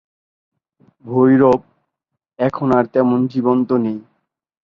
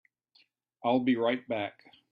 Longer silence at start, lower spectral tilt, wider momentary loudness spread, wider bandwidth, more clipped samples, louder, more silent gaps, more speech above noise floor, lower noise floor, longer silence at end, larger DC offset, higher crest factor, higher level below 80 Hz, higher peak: first, 1.05 s vs 0.85 s; about the same, -9.5 dB/octave vs -8.5 dB/octave; about the same, 10 LU vs 8 LU; about the same, 5.4 kHz vs 5 kHz; neither; first, -16 LUFS vs -30 LUFS; neither; first, 64 dB vs 39 dB; first, -79 dBFS vs -68 dBFS; first, 0.75 s vs 0.4 s; neither; about the same, 16 dB vs 18 dB; first, -56 dBFS vs -76 dBFS; first, -2 dBFS vs -14 dBFS